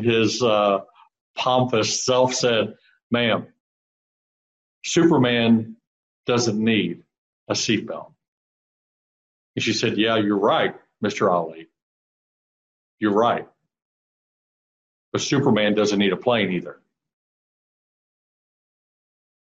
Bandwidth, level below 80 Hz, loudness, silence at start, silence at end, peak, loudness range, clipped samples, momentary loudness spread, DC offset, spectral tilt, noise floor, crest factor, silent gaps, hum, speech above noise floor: 8.4 kHz; -64 dBFS; -21 LUFS; 0 s; 2.8 s; -4 dBFS; 6 LU; under 0.1%; 11 LU; under 0.1%; -4.5 dB/octave; under -90 dBFS; 18 dB; 1.21-1.34 s, 3.03-3.10 s, 3.60-4.81 s, 5.87-6.24 s, 7.18-7.47 s, 8.28-9.54 s, 11.82-12.98 s, 13.82-15.12 s; none; over 70 dB